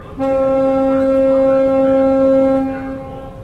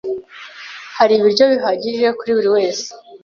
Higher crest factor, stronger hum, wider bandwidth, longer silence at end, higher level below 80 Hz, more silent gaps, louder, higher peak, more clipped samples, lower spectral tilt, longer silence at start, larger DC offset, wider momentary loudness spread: about the same, 10 dB vs 14 dB; neither; second, 5 kHz vs 7.2 kHz; about the same, 0 s vs 0.05 s; first, -40 dBFS vs -62 dBFS; neither; about the same, -14 LUFS vs -15 LUFS; about the same, -4 dBFS vs -2 dBFS; neither; first, -8.5 dB/octave vs -3.5 dB/octave; about the same, 0 s vs 0.05 s; neither; second, 13 LU vs 20 LU